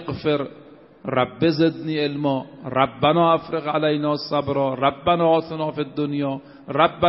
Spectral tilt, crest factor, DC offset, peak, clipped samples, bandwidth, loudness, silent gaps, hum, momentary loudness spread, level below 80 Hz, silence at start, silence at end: -4.5 dB/octave; 20 dB; under 0.1%; -2 dBFS; under 0.1%; 5.8 kHz; -22 LUFS; none; none; 9 LU; -56 dBFS; 0 s; 0 s